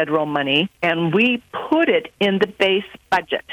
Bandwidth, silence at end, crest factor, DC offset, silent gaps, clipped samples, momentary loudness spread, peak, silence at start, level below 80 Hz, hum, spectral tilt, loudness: 14 kHz; 0 s; 16 dB; under 0.1%; none; under 0.1%; 5 LU; -2 dBFS; 0 s; -60 dBFS; none; -6 dB/octave; -19 LUFS